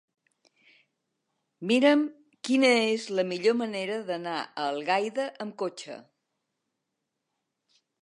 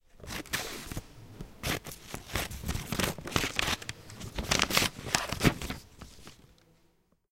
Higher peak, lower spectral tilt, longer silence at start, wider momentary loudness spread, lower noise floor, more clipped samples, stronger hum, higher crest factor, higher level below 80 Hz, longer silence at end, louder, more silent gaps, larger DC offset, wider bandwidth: second, -8 dBFS vs 0 dBFS; about the same, -4 dB/octave vs -3 dB/octave; first, 1.6 s vs 0.15 s; second, 15 LU vs 21 LU; first, -83 dBFS vs -69 dBFS; neither; neither; second, 20 dB vs 34 dB; second, -84 dBFS vs -46 dBFS; first, 2 s vs 0.9 s; first, -27 LUFS vs -32 LUFS; neither; neither; second, 11 kHz vs 17 kHz